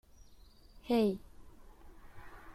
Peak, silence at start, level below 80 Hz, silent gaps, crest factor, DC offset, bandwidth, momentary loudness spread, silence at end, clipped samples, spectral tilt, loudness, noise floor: -20 dBFS; 0.75 s; -58 dBFS; none; 20 dB; under 0.1%; 14.5 kHz; 25 LU; 0 s; under 0.1%; -7 dB/octave; -33 LUFS; -58 dBFS